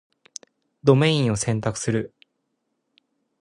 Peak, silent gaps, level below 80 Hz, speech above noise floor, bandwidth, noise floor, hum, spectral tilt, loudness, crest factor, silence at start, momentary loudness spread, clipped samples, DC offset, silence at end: -2 dBFS; none; -54 dBFS; 55 dB; 11.5 kHz; -75 dBFS; none; -5.5 dB/octave; -22 LUFS; 22 dB; 0.85 s; 23 LU; under 0.1%; under 0.1%; 1.35 s